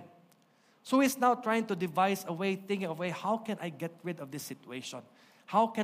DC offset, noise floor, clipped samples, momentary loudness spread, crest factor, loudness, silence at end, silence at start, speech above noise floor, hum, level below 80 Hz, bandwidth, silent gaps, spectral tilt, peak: under 0.1%; -67 dBFS; under 0.1%; 14 LU; 20 dB; -32 LUFS; 0 s; 0 s; 35 dB; none; -82 dBFS; 15.5 kHz; none; -5 dB/octave; -14 dBFS